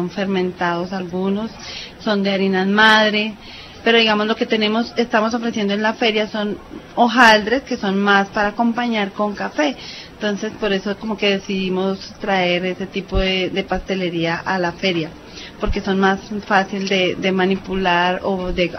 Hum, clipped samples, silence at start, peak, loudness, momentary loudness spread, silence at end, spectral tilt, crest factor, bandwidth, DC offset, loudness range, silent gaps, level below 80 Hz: none; under 0.1%; 0 s; 0 dBFS; -18 LUFS; 11 LU; 0 s; -5 dB/octave; 18 dB; 11 kHz; under 0.1%; 5 LU; none; -38 dBFS